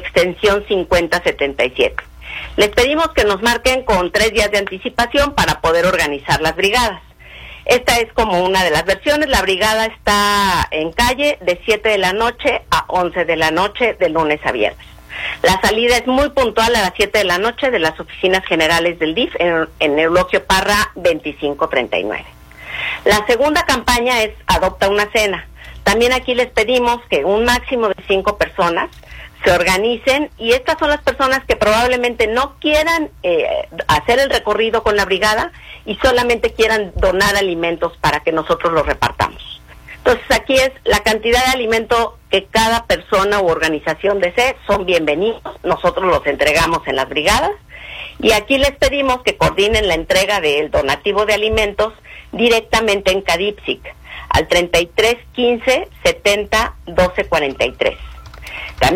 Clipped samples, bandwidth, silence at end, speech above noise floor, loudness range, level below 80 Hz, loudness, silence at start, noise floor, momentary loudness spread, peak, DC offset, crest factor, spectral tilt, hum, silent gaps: under 0.1%; 16.5 kHz; 0 s; 21 dB; 2 LU; -34 dBFS; -15 LUFS; 0 s; -36 dBFS; 7 LU; 0 dBFS; under 0.1%; 16 dB; -3.5 dB/octave; none; none